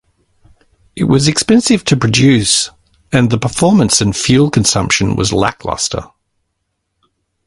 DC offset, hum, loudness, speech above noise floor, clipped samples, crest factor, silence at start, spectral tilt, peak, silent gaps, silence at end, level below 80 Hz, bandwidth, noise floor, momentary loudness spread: under 0.1%; none; -12 LUFS; 58 dB; under 0.1%; 14 dB; 0.95 s; -4.5 dB/octave; 0 dBFS; none; 1.4 s; -38 dBFS; 11.5 kHz; -70 dBFS; 8 LU